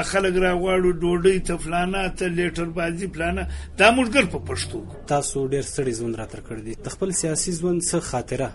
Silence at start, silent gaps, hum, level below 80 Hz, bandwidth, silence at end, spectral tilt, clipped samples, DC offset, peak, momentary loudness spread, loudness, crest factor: 0 s; none; none; -36 dBFS; 11.5 kHz; 0 s; -4.5 dB/octave; under 0.1%; under 0.1%; -2 dBFS; 11 LU; -23 LUFS; 20 dB